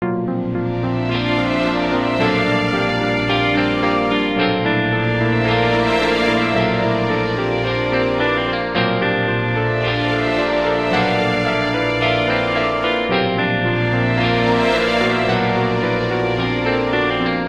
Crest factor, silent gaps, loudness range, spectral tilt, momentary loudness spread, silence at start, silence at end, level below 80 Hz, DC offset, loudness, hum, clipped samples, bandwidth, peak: 16 dB; none; 1 LU; -6.5 dB/octave; 3 LU; 0 s; 0 s; -40 dBFS; 0.3%; -17 LUFS; none; under 0.1%; 9.8 kHz; -2 dBFS